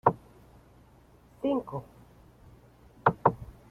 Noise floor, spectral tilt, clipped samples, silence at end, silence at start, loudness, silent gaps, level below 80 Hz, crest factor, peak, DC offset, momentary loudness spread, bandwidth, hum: -58 dBFS; -9 dB/octave; under 0.1%; 0.25 s; 0.05 s; -30 LUFS; none; -58 dBFS; 26 dB; -6 dBFS; under 0.1%; 17 LU; 14.5 kHz; none